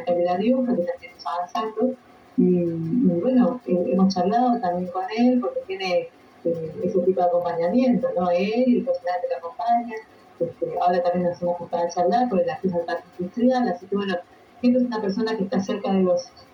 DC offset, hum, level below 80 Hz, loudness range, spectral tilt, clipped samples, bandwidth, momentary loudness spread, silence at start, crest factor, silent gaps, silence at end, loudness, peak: under 0.1%; none; -64 dBFS; 3 LU; -7.5 dB/octave; under 0.1%; 6.6 kHz; 9 LU; 0 s; 14 dB; none; 0.1 s; -23 LUFS; -8 dBFS